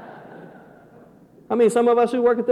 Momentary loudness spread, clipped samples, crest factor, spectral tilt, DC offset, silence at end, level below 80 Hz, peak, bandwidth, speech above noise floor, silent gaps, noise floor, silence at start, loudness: 22 LU; under 0.1%; 14 dB; -5.5 dB/octave; under 0.1%; 0 s; -66 dBFS; -8 dBFS; 12.5 kHz; 32 dB; none; -49 dBFS; 0 s; -19 LUFS